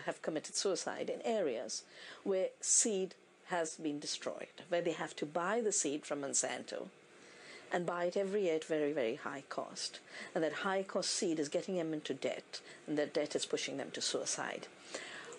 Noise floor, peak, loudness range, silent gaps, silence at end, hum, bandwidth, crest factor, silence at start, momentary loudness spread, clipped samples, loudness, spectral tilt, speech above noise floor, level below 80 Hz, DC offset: -57 dBFS; -18 dBFS; 3 LU; none; 0 s; none; 11 kHz; 20 dB; 0 s; 11 LU; under 0.1%; -37 LUFS; -2.5 dB/octave; 19 dB; under -90 dBFS; under 0.1%